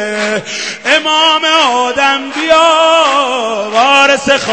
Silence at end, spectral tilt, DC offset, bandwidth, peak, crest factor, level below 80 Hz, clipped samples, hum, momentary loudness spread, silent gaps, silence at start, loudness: 0 s; -1.5 dB/octave; 0.3%; 11 kHz; 0 dBFS; 10 dB; -52 dBFS; 0.3%; none; 8 LU; none; 0 s; -9 LUFS